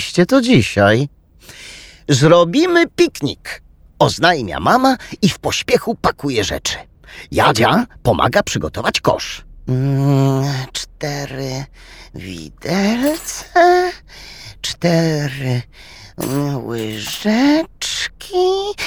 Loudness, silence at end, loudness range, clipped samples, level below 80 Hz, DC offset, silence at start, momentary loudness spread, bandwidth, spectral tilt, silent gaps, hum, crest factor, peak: -16 LUFS; 0 s; 5 LU; under 0.1%; -42 dBFS; under 0.1%; 0 s; 19 LU; over 20 kHz; -5 dB/octave; none; none; 16 dB; 0 dBFS